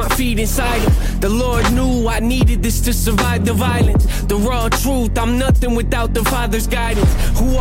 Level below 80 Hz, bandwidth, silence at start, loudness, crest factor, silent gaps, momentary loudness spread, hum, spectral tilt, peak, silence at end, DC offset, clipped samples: -18 dBFS; 16.5 kHz; 0 s; -16 LUFS; 10 dB; none; 3 LU; none; -5 dB/octave; -4 dBFS; 0 s; under 0.1%; under 0.1%